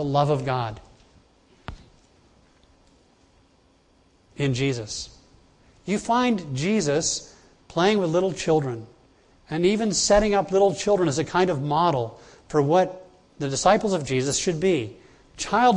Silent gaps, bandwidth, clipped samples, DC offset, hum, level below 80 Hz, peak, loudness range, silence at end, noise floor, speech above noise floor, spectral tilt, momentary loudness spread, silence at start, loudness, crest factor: none; 11 kHz; under 0.1%; under 0.1%; none; -50 dBFS; -4 dBFS; 10 LU; 0 s; -60 dBFS; 38 dB; -4.5 dB/octave; 14 LU; 0 s; -23 LUFS; 20 dB